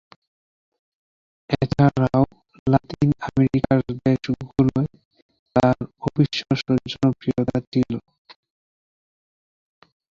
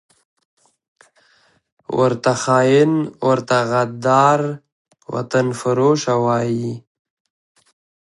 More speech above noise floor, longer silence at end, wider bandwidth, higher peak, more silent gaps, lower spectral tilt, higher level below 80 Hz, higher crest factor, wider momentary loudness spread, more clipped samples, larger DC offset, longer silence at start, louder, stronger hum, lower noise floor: first, over 70 dB vs 41 dB; first, 2.1 s vs 1.3 s; second, 7.4 kHz vs 11.5 kHz; about the same, -4 dBFS vs -2 dBFS; first, 2.59-2.66 s, 5.05-5.11 s, 5.22-5.29 s, 5.39-5.46 s, 7.67-7.72 s vs 4.72-4.85 s; first, -8 dB/octave vs -6 dB/octave; first, -48 dBFS vs -62 dBFS; about the same, 20 dB vs 18 dB; second, 7 LU vs 13 LU; neither; neither; second, 1.5 s vs 1.9 s; second, -22 LUFS vs -17 LUFS; neither; first, under -90 dBFS vs -58 dBFS